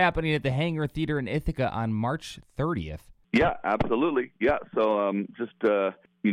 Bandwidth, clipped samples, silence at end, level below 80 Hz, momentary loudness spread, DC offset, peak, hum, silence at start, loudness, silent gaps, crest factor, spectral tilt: 14.5 kHz; under 0.1%; 0 s; -46 dBFS; 7 LU; under 0.1%; -10 dBFS; none; 0 s; -27 LUFS; none; 18 dB; -7.5 dB/octave